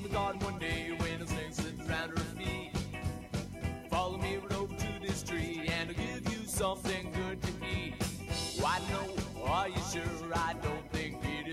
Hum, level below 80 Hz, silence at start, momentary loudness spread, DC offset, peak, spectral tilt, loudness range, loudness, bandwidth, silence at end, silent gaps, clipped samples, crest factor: none; -48 dBFS; 0 s; 5 LU; under 0.1%; -20 dBFS; -4.5 dB/octave; 2 LU; -36 LUFS; 16 kHz; 0 s; none; under 0.1%; 16 dB